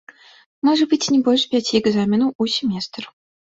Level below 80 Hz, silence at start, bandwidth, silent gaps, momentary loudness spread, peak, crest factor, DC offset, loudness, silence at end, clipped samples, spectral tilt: -60 dBFS; 0.65 s; 8 kHz; 2.35-2.39 s; 11 LU; -4 dBFS; 16 dB; under 0.1%; -18 LUFS; 0.4 s; under 0.1%; -4.5 dB/octave